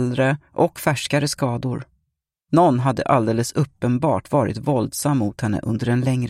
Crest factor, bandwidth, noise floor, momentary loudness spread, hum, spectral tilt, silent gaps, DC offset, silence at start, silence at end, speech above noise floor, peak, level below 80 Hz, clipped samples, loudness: 18 dB; 16 kHz; -76 dBFS; 6 LU; none; -6 dB/octave; none; under 0.1%; 0 s; 0 s; 56 dB; -2 dBFS; -52 dBFS; under 0.1%; -21 LUFS